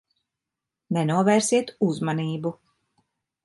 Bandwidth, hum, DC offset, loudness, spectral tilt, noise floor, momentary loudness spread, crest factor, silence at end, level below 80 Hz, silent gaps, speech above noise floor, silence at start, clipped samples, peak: 11.5 kHz; none; under 0.1%; -24 LUFS; -5.5 dB/octave; -86 dBFS; 10 LU; 18 dB; 0.9 s; -70 dBFS; none; 64 dB; 0.9 s; under 0.1%; -8 dBFS